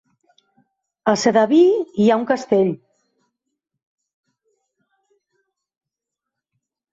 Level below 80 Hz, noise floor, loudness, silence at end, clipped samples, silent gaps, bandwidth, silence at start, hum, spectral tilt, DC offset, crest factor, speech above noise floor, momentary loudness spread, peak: -68 dBFS; -84 dBFS; -17 LUFS; 4.15 s; under 0.1%; none; 8 kHz; 1.05 s; none; -5.5 dB/octave; under 0.1%; 20 dB; 69 dB; 9 LU; -2 dBFS